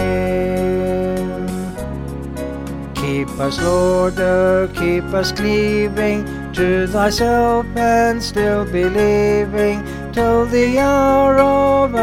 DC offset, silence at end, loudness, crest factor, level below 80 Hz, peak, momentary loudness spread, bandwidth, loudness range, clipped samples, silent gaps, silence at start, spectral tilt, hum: under 0.1%; 0 s; -17 LUFS; 14 dB; -32 dBFS; -2 dBFS; 11 LU; 16.5 kHz; 6 LU; under 0.1%; none; 0 s; -6 dB/octave; none